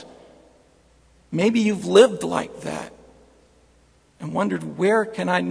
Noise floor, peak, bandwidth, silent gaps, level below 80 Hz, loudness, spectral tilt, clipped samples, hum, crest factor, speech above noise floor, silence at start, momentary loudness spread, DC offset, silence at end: -57 dBFS; -2 dBFS; 10.5 kHz; none; -60 dBFS; -21 LUFS; -5.5 dB/octave; under 0.1%; none; 22 dB; 37 dB; 0 s; 16 LU; under 0.1%; 0 s